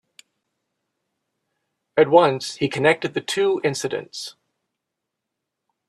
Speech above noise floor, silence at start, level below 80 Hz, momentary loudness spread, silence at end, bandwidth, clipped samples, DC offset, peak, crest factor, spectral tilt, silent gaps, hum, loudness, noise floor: 62 dB; 1.95 s; -68 dBFS; 15 LU; 1.6 s; 13 kHz; under 0.1%; under 0.1%; -2 dBFS; 22 dB; -4.5 dB/octave; none; none; -20 LUFS; -82 dBFS